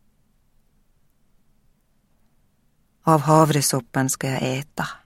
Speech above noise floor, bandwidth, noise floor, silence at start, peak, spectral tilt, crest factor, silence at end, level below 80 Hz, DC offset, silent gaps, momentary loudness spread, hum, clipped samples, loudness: 43 dB; 16.5 kHz; -63 dBFS; 3.05 s; -2 dBFS; -5 dB/octave; 22 dB; 0.1 s; -60 dBFS; under 0.1%; none; 11 LU; none; under 0.1%; -20 LUFS